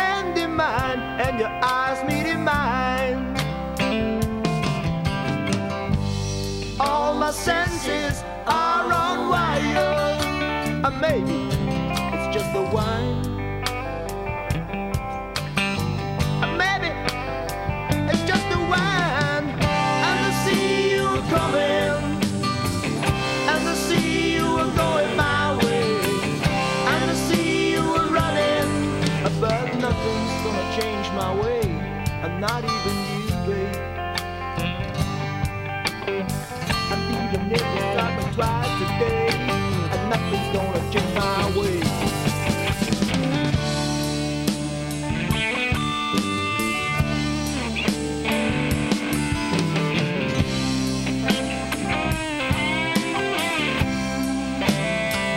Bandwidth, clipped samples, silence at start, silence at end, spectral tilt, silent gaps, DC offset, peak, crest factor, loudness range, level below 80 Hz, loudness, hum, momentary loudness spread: 16 kHz; under 0.1%; 0 s; 0 s; -5 dB/octave; none; under 0.1%; -4 dBFS; 18 dB; 4 LU; -38 dBFS; -23 LUFS; none; 6 LU